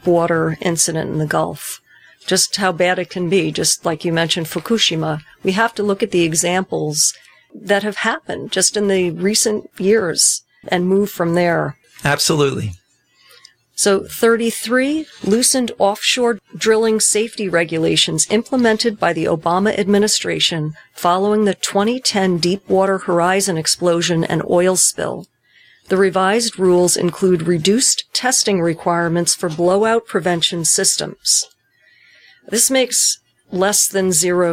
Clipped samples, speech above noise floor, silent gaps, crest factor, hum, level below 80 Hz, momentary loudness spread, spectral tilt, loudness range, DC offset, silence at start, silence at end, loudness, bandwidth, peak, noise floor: under 0.1%; 39 dB; none; 16 dB; none; -56 dBFS; 7 LU; -3 dB/octave; 2 LU; under 0.1%; 0.05 s; 0 s; -16 LUFS; 16.5 kHz; -2 dBFS; -55 dBFS